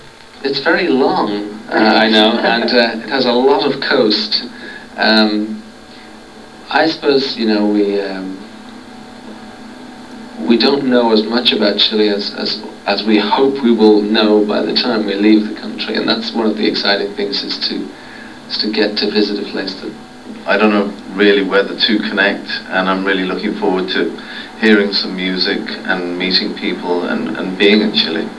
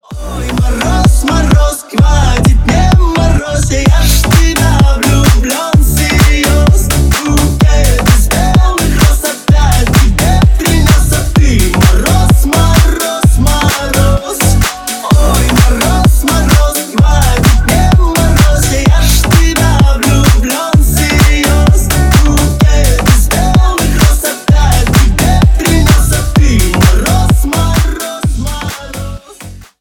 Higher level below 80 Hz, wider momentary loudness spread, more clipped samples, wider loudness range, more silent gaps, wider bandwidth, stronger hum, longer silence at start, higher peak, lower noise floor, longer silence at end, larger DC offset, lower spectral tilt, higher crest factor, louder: second, -54 dBFS vs -10 dBFS; first, 17 LU vs 4 LU; second, under 0.1% vs 0.7%; first, 5 LU vs 1 LU; neither; second, 11 kHz vs 20 kHz; neither; about the same, 0 s vs 0.1 s; about the same, 0 dBFS vs 0 dBFS; first, -36 dBFS vs -30 dBFS; second, 0 s vs 0.15 s; first, 0.4% vs under 0.1%; about the same, -5.5 dB/octave vs -5 dB/octave; first, 14 dB vs 8 dB; second, -14 LUFS vs -9 LUFS